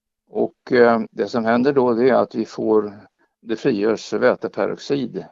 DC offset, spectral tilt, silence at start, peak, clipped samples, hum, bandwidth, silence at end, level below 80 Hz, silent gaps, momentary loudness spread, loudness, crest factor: under 0.1%; -6.5 dB/octave; 0.35 s; 0 dBFS; under 0.1%; none; 7.6 kHz; 0.05 s; -64 dBFS; none; 9 LU; -19 LUFS; 18 dB